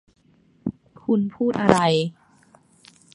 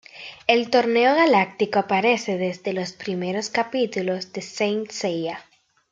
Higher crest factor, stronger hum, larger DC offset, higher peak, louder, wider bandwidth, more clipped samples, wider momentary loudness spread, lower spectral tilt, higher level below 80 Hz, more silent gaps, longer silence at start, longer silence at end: about the same, 24 dB vs 20 dB; neither; neither; about the same, 0 dBFS vs -2 dBFS; about the same, -22 LUFS vs -22 LUFS; first, 11.5 kHz vs 9 kHz; neither; first, 15 LU vs 11 LU; first, -6 dB/octave vs -4.5 dB/octave; first, -54 dBFS vs -70 dBFS; neither; first, 0.65 s vs 0.15 s; first, 1.05 s vs 0.5 s